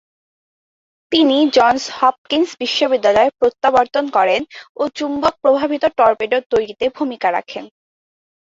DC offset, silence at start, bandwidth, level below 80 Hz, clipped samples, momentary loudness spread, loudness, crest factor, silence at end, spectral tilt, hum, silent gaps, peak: under 0.1%; 1.1 s; 7.8 kHz; -54 dBFS; under 0.1%; 9 LU; -16 LUFS; 16 dB; 0.8 s; -3.5 dB/octave; none; 2.18-2.25 s, 4.69-4.75 s, 6.46-6.50 s; 0 dBFS